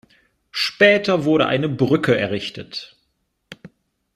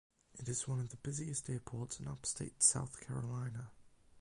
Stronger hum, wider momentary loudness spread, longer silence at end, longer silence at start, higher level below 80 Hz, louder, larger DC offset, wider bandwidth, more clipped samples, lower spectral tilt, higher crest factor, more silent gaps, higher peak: neither; first, 17 LU vs 14 LU; first, 0.5 s vs 0 s; first, 0.55 s vs 0.35 s; first, -58 dBFS vs -64 dBFS; first, -18 LUFS vs -38 LUFS; neither; first, 14 kHz vs 11.5 kHz; neither; first, -6 dB/octave vs -3.5 dB/octave; about the same, 20 dB vs 24 dB; neither; first, 0 dBFS vs -16 dBFS